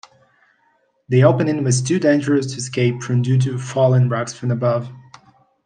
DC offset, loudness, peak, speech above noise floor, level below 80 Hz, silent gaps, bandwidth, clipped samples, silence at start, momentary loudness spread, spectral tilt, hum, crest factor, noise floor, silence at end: under 0.1%; -18 LUFS; -2 dBFS; 45 dB; -62 dBFS; none; 9.6 kHz; under 0.1%; 1.1 s; 8 LU; -6.5 dB/octave; none; 16 dB; -62 dBFS; 0.65 s